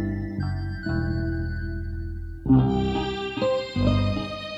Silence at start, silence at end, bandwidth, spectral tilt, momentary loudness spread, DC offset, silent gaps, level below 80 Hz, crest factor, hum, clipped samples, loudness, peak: 0 s; 0 s; 7.8 kHz; -8 dB/octave; 12 LU; under 0.1%; none; -34 dBFS; 18 dB; none; under 0.1%; -26 LUFS; -8 dBFS